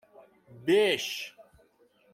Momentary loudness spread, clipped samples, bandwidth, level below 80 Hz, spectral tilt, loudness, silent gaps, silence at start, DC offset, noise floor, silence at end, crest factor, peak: 14 LU; under 0.1%; 16 kHz; -74 dBFS; -3.5 dB/octave; -27 LUFS; none; 0.5 s; under 0.1%; -65 dBFS; 0.7 s; 18 dB; -12 dBFS